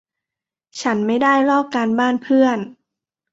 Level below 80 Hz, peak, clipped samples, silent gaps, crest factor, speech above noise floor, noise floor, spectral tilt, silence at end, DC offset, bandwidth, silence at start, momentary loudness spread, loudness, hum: -66 dBFS; -2 dBFS; under 0.1%; none; 16 dB; 71 dB; -87 dBFS; -5 dB/octave; 0.6 s; under 0.1%; 7.8 kHz; 0.75 s; 11 LU; -17 LUFS; none